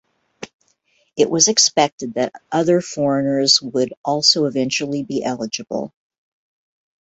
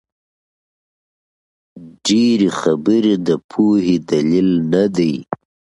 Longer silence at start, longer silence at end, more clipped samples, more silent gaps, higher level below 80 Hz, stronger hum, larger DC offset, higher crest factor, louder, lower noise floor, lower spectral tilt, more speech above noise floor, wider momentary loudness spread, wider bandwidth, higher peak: second, 0.4 s vs 1.75 s; first, 1.15 s vs 0.45 s; neither; first, 0.54-0.59 s, 1.92-1.98 s, 3.97-4.04 s vs 3.44-3.49 s; second, -62 dBFS vs -54 dBFS; neither; neither; about the same, 20 dB vs 16 dB; about the same, -17 LUFS vs -16 LUFS; second, -63 dBFS vs under -90 dBFS; second, -2.5 dB/octave vs -6 dB/octave; second, 45 dB vs over 75 dB; first, 17 LU vs 7 LU; second, 8.2 kHz vs 11.5 kHz; about the same, 0 dBFS vs 0 dBFS